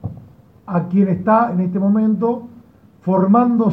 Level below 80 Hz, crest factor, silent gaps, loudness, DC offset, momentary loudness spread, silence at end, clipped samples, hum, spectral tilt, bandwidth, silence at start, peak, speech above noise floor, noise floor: -54 dBFS; 14 dB; none; -17 LUFS; under 0.1%; 11 LU; 0 s; under 0.1%; none; -12 dB/octave; 3.5 kHz; 0.05 s; -2 dBFS; 31 dB; -46 dBFS